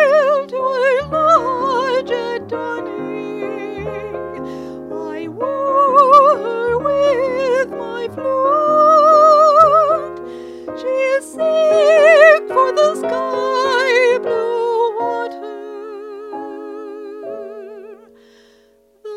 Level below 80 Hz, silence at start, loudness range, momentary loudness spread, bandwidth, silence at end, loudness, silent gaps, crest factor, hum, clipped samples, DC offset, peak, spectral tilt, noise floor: -54 dBFS; 0 s; 12 LU; 21 LU; 11 kHz; 0 s; -14 LUFS; none; 16 dB; none; under 0.1%; under 0.1%; 0 dBFS; -4 dB/octave; -53 dBFS